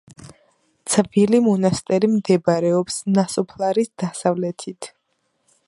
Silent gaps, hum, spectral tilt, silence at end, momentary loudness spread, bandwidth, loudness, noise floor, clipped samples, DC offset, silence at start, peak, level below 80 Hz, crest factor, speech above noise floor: none; none; -5.5 dB/octave; 0.8 s; 14 LU; 11.5 kHz; -19 LUFS; -70 dBFS; under 0.1%; under 0.1%; 0.2 s; 0 dBFS; -60 dBFS; 20 dB; 51 dB